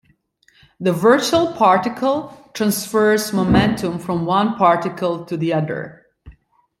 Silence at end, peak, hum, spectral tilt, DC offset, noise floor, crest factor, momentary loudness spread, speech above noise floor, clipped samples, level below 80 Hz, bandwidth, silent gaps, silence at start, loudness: 0.5 s; -2 dBFS; none; -5.5 dB/octave; under 0.1%; -58 dBFS; 16 dB; 9 LU; 41 dB; under 0.1%; -46 dBFS; 16.5 kHz; none; 0.8 s; -18 LUFS